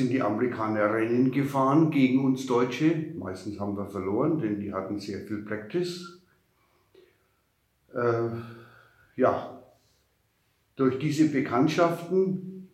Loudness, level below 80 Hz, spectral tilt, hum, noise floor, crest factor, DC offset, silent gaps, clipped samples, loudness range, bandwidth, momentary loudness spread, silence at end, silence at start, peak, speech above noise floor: -27 LUFS; -74 dBFS; -7 dB/octave; none; -71 dBFS; 18 dB; under 0.1%; none; under 0.1%; 10 LU; 13.5 kHz; 13 LU; 0.1 s; 0 s; -10 dBFS; 45 dB